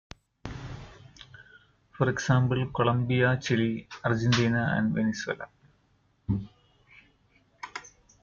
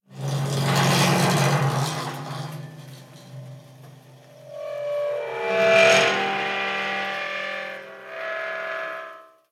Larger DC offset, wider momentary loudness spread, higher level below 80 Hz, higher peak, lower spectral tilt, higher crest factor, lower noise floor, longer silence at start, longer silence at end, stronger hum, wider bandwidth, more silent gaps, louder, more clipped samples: neither; about the same, 21 LU vs 23 LU; first, -54 dBFS vs -72 dBFS; second, -10 dBFS vs -4 dBFS; first, -6 dB/octave vs -4.5 dB/octave; about the same, 20 dB vs 20 dB; first, -67 dBFS vs -48 dBFS; first, 0.45 s vs 0.1 s; about the same, 0.35 s vs 0.25 s; neither; second, 7.4 kHz vs 16.5 kHz; neither; second, -27 LUFS vs -22 LUFS; neither